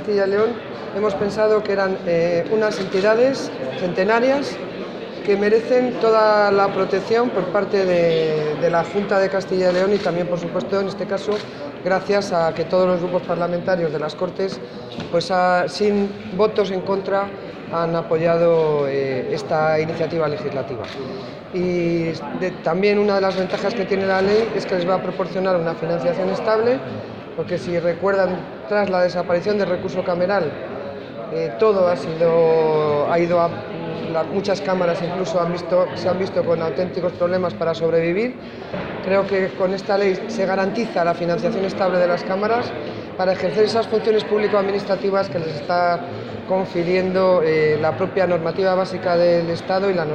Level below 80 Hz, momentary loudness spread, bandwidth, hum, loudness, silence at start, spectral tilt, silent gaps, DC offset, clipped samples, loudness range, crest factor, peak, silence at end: -54 dBFS; 9 LU; 9.2 kHz; none; -20 LUFS; 0 s; -6.5 dB/octave; none; under 0.1%; under 0.1%; 3 LU; 16 dB; -4 dBFS; 0 s